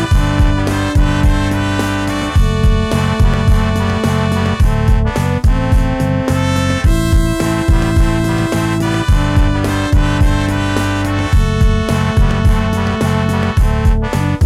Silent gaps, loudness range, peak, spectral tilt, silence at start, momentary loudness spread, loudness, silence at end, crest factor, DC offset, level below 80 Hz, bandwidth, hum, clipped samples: none; 0 LU; -2 dBFS; -6.5 dB/octave; 0 s; 2 LU; -14 LUFS; 0 s; 10 dB; under 0.1%; -16 dBFS; 14 kHz; none; under 0.1%